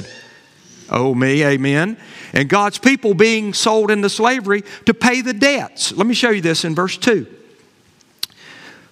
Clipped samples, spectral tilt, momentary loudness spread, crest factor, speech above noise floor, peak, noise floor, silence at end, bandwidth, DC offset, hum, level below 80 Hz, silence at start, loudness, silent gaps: under 0.1%; -4 dB/octave; 9 LU; 18 dB; 37 dB; 0 dBFS; -53 dBFS; 0.2 s; 16 kHz; under 0.1%; none; -60 dBFS; 0 s; -16 LUFS; none